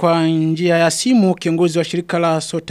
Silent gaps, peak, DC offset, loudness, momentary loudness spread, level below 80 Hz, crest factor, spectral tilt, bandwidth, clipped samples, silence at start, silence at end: none; -2 dBFS; under 0.1%; -16 LUFS; 5 LU; -58 dBFS; 14 dB; -5.5 dB/octave; 14 kHz; under 0.1%; 0 s; 0 s